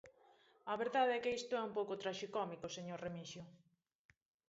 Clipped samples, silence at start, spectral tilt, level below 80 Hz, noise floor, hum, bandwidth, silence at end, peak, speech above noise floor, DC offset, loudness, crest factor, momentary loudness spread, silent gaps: under 0.1%; 0.05 s; -3 dB/octave; -80 dBFS; -70 dBFS; none; 7.6 kHz; 0.9 s; -24 dBFS; 29 dB; under 0.1%; -41 LUFS; 20 dB; 16 LU; none